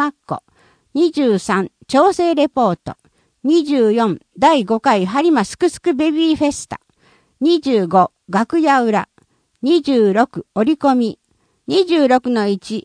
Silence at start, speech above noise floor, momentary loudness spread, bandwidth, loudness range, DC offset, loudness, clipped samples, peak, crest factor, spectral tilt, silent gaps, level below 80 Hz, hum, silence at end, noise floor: 0 s; 41 dB; 10 LU; 10.5 kHz; 2 LU; under 0.1%; -16 LUFS; under 0.1%; 0 dBFS; 16 dB; -5.5 dB/octave; none; -56 dBFS; none; 0.05 s; -56 dBFS